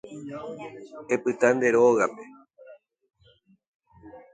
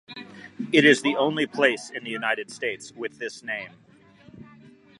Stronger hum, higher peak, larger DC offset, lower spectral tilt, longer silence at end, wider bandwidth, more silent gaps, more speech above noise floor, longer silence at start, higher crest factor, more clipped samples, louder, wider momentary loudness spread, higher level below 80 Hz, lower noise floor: neither; about the same, -6 dBFS vs -4 dBFS; neither; first, -5.5 dB/octave vs -4 dB/octave; second, 0.15 s vs 0.55 s; second, 9.2 kHz vs 11.5 kHz; first, 3.68-3.80 s vs none; first, 37 dB vs 28 dB; about the same, 0.05 s vs 0.1 s; about the same, 22 dB vs 22 dB; neither; about the same, -23 LUFS vs -24 LUFS; about the same, 21 LU vs 20 LU; about the same, -70 dBFS vs -72 dBFS; first, -61 dBFS vs -53 dBFS